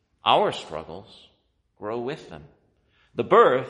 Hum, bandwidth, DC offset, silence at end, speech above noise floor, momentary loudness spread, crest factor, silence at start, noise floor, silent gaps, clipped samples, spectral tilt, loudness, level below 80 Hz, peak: none; 10.5 kHz; under 0.1%; 0 s; 45 dB; 24 LU; 20 dB; 0.25 s; -68 dBFS; none; under 0.1%; -5.5 dB/octave; -23 LUFS; -62 dBFS; -4 dBFS